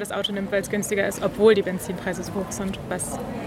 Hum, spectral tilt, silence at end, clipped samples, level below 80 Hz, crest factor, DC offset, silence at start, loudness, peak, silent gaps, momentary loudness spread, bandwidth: none; -4.5 dB/octave; 0 s; under 0.1%; -48 dBFS; 20 dB; under 0.1%; 0 s; -24 LUFS; -4 dBFS; none; 11 LU; 16 kHz